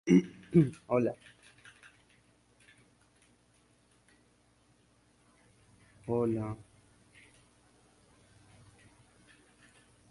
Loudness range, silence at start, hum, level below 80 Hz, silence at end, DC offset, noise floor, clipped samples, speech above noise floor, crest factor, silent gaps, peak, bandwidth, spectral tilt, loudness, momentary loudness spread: 12 LU; 0.05 s; 60 Hz at -65 dBFS; -66 dBFS; 3.55 s; under 0.1%; -68 dBFS; under 0.1%; 39 dB; 24 dB; none; -12 dBFS; 11.5 kHz; -8 dB/octave; -31 LUFS; 29 LU